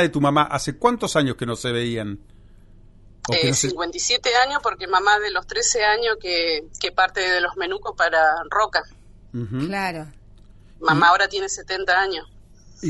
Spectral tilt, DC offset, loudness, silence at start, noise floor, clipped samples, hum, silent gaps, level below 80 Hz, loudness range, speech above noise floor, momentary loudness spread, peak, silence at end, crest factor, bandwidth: -3 dB/octave; under 0.1%; -20 LUFS; 0 s; -47 dBFS; under 0.1%; none; none; -48 dBFS; 4 LU; 26 dB; 10 LU; -2 dBFS; 0 s; 20 dB; 11.5 kHz